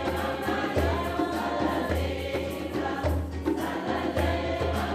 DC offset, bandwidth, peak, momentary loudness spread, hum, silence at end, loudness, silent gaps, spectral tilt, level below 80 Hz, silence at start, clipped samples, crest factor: under 0.1%; 15.5 kHz; -12 dBFS; 4 LU; none; 0 s; -29 LUFS; none; -6 dB/octave; -38 dBFS; 0 s; under 0.1%; 16 dB